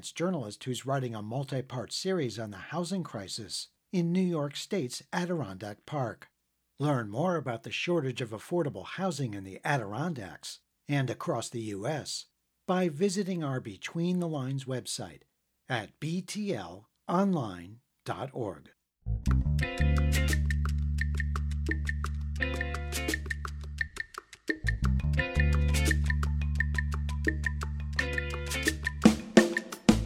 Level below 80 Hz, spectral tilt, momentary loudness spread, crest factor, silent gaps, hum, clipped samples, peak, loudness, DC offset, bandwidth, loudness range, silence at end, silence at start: -36 dBFS; -5.5 dB/octave; 11 LU; 26 dB; none; none; under 0.1%; -6 dBFS; -32 LUFS; under 0.1%; 15.5 kHz; 5 LU; 0 s; 0 s